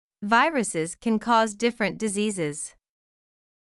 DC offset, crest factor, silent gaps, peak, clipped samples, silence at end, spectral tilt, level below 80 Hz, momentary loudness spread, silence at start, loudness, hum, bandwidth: under 0.1%; 18 dB; none; -8 dBFS; under 0.1%; 1.05 s; -4 dB/octave; -62 dBFS; 9 LU; 0.2 s; -24 LUFS; none; 12 kHz